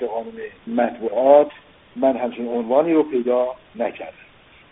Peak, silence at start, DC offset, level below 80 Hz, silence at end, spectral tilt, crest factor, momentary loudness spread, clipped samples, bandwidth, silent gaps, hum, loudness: 0 dBFS; 0 s; under 0.1%; -62 dBFS; 0.6 s; -1.5 dB/octave; 20 dB; 20 LU; under 0.1%; 3.9 kHz; none; none; -20 LUFS